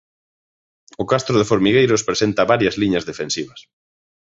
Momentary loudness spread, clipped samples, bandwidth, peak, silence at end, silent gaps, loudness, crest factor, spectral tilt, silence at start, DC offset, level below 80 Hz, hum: 10 LU; under 0.1%; 8 kHz; -2 dBFS; 0.7 s; none; -18 LUFS; 18 dB; -4.5 dB/octave; 1 s; under 0.1%; -50 dBFS; none